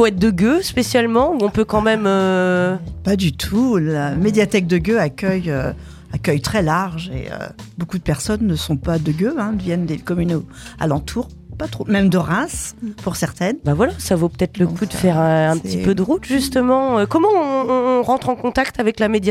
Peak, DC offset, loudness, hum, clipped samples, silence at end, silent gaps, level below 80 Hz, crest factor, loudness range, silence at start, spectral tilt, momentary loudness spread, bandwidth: -2 dBFS; under 0.1%; -18 LUFS; none; under 0.1%; 0 s; none; -38 dBFS; 16 dB; 5 LU; 0 s; -6 dB/octave; 11 LU; 15.5 kHz